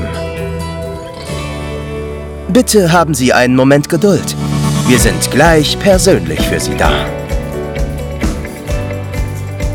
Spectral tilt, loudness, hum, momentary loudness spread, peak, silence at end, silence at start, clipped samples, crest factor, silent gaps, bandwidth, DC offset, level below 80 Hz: -5 dB/octave; -13 LUFS; none; 13 LU; 0 dBFS; 0 s; 0 s; 0.6%; 12 dB; none; over 20 kHz; under 0.1%; -24 dBFS